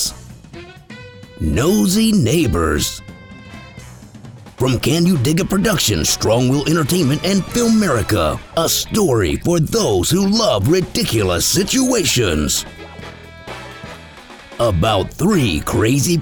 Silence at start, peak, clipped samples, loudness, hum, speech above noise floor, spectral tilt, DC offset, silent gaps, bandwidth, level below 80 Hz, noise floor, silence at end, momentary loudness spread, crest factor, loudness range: 0 s; -4 dBFS; under 0.1%; -16 LUFS; none; 23 dB; -4.5 dB/octave; under 0.1%; none; over 20 kHz; -34 dBFS; -38 dBFS; 0 s; 21 LU; 14 dB; 4 LU